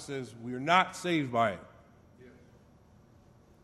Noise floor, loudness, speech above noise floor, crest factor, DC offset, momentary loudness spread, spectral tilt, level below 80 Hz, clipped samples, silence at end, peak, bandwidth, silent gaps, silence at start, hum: -60 dBFS; -30 LUFS; 29 dB; 26 dB; under 0.1%; 14 LU; -5 dB/octave; -70 dBFS; under 0.1%; 1.35 s; -8 dBFS; 13.5 kHz; none; 0 s; none